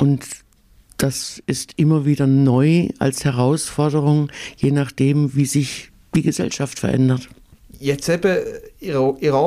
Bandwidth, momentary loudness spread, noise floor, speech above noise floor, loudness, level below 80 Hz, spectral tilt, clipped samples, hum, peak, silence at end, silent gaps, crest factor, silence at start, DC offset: 15 kHz; 10 LU; -51 dBFS; 33 dB; -19 LUFS; -48 dBFS; -6 dB/octave; under 0.1%; none; -6 dBFS; 0 s; none; 12 dB; 0 s; under 0.1%